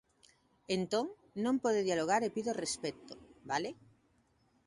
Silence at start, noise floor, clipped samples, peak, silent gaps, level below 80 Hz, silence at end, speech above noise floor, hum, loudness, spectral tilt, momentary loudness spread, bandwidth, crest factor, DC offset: 0.7 s; -72 dBFS; under 0.1%; -18 dBFS; none; -72 dBFS; 0.95 s; 38 dB; none; -35 LUFS; -4 dB/octave; 12 LU; 11.5 kHz; 20 dB; under 0.1%